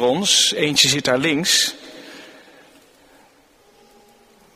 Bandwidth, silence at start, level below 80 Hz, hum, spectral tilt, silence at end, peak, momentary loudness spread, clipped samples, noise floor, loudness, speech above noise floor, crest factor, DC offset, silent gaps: 15.5 kHz; 0 s; -60 dBFS; none; -2 dB/octave; 2.25 s; 0 dBFS; 24 LU; under 0.1%; -54 dBFS; -16 LUFS; 36 dB; 22 dB; under 0.1%; none